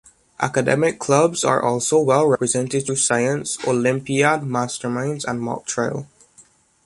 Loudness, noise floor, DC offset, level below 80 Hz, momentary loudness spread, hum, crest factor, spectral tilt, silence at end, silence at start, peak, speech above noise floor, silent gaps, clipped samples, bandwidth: -20 LUFS; -53 dBFS; under 0.1%; -60 dBFS; 8 LU; none; 18 dB; -4.5 dB/octave; 0.45 s; 0.4 s; -2 dBFS; 34 dB; none; under 0.1%; 11.5 kHz